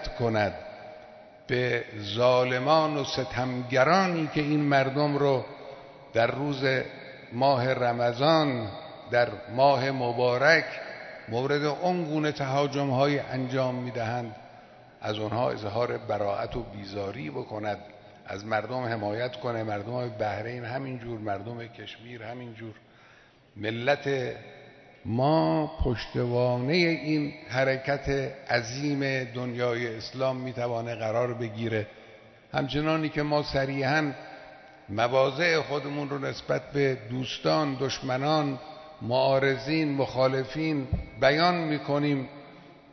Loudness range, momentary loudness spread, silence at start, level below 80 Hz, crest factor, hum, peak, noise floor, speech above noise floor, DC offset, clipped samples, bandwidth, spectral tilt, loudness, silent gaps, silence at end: 8 LU; 16 LU; 0 s; -50 dBFS; 20 dB; none; -6 dBFS; -57 dBFS; 29 dB; under 0.1%; under 0.1%; 6.4 kHz; -6 dB/octave; -27 LUFS; none; 0.2 s